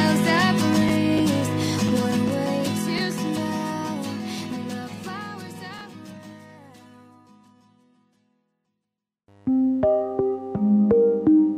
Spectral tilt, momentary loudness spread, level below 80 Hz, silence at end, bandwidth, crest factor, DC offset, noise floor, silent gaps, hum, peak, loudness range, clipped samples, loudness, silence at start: -5.5 dB/octave; 18 LU; -56 dBFS; 0 s; 15.5 kHz; 16 dB; under 0.1%; -84 dBFS; none; none; -8 dBFS; 18 LU; under 0.1%; -23 LUFS; 0 s